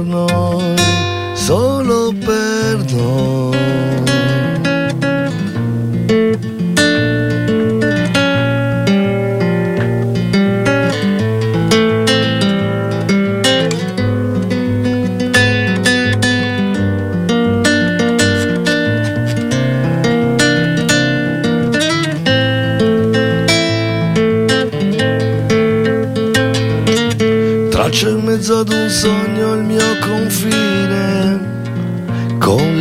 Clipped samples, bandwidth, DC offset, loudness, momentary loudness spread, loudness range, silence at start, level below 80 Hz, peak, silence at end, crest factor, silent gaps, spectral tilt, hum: under 0.1%; 16 kHz; under 0.1%; -14 LUFS; 4 LU; 1 LU; 0 s; -40 dBFS; 0 dBFS; 0 s; 14 dB; none; -5.5 dB/octave; none